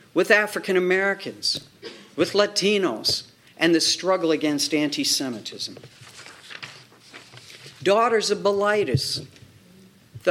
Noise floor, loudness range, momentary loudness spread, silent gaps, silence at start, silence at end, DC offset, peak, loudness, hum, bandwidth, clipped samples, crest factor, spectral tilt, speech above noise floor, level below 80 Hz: -52 dBFS; 5 LU; 22 LU; none; 0.15 s; 0 s; under 0.1%; -2 dBFS; -22 LUFS; none; 17 kHz; under 0.1%; 22 dB; -3.5 dB/octave; 29 dB; -64 dBFS